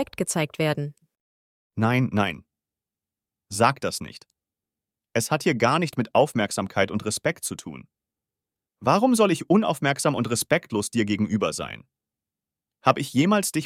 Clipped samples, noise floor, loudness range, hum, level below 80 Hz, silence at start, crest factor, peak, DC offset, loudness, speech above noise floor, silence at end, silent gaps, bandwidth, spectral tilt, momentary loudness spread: under 0.1%; -90 dBFS; 5 LU; none; -62 dBFS; 0 s; 22 dB; -4 dBFS; under 0.1%; -24 LUFS; 66 dB; 0 s; 1.20-1.70 s; 16.5 kHz; -5 dB/octave; 13 LU